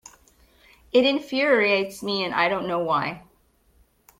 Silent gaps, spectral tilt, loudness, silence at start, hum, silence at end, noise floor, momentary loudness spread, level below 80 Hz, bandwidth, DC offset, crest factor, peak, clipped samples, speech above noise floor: none; -4.5 dB/octave; -22 LUFS; 0.95 s; none; 1 s; -62 dBFS; 7 LU; -62 dBFS; 16 kHz; under 0.1%; 18 dB; -6 dBFS; under 0.1%; 40 dB